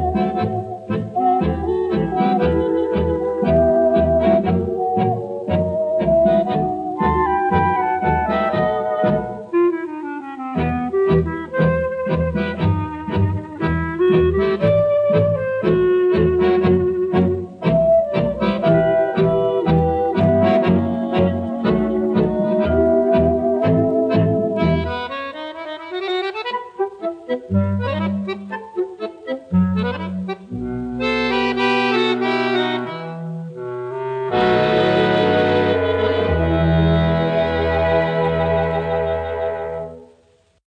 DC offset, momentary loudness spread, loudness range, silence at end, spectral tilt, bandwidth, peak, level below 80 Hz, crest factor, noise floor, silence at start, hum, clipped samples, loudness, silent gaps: under 0.1%; 10 LU; 6 LU; 0.75 s; -8.5 dB/octave; 7.4 kHz; -4 dBFS; -36 dBFS; 14 dB; -56 dBFS; 0 s; none; under 0.1%; -18 LUFS; none